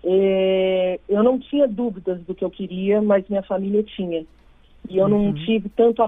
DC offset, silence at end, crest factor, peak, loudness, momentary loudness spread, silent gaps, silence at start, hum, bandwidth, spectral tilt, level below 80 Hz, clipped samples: under 0.1%; 0 s; 16 dB; -4 dBFS; -21 LUFS; 9 LU; none; 0.05 s; none; 3.8 kHz; -9.5 dB/octave; -50 dBFS; under 0.1%